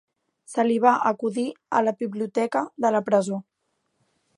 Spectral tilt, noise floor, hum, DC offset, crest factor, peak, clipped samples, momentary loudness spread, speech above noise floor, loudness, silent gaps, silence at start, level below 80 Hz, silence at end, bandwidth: -6 dB/octave; -75 dBFS; none; under 0.1%; 20 dB; -4 dBFS; under 0.1%; 10 LU; 52 dB; -24 LUFS; none; 0.5 s; -78 dBFS; 0.95 s; 11.5 kHz